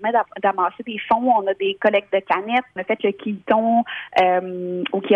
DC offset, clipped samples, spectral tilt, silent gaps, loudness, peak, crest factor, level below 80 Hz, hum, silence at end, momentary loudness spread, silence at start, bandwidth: under 0.1%; under 0.1%; -7 dB/octave; none; -21 LUFS; -2 dBFS; 18 dB; -64 dBFS; none; 0 s; 7 LU; 0 s; 7 kHz